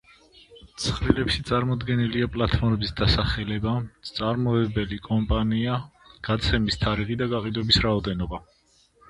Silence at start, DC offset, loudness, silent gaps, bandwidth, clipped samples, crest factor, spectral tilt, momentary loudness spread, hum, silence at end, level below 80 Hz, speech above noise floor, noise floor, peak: 0.5 s; under 0.1%; -25 LUFS; none; 11.5 kHz; under 0.1%; 22 dB; -6 dB/octave; 8 LU; none; 0.7 s; -36 dBFS; 37 dB; -61 dBFS; -2 dBFS